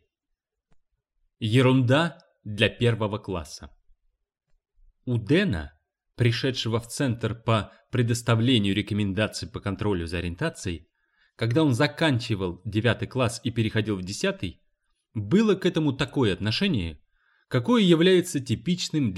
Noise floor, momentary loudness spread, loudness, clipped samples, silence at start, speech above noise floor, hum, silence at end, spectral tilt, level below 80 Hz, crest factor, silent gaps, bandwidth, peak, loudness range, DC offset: -82 dBFS; 13 LU; -25 LUFS; under 0.1%; 1.4 s; 58 dB; none; 0 s; -6 dB/octave; -50 dBFS; 20 dB; none; 13.5 kHz; -6 dBFS; 4 LU; under 0.1%